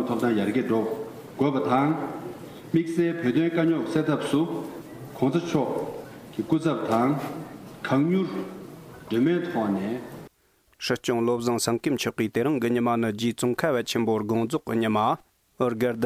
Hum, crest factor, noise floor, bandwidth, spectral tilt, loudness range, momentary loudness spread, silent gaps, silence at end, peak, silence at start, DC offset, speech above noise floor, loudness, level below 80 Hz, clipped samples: none; 16 dB; -64 dBFS; 16 kHz; -6 dB/octave; 3 LU; 14 LU; none; 0 s; -10 dBFS; 0 s; under 0.1%; 40 dB; -26 LUFS; -64 dBFS; under 0.1%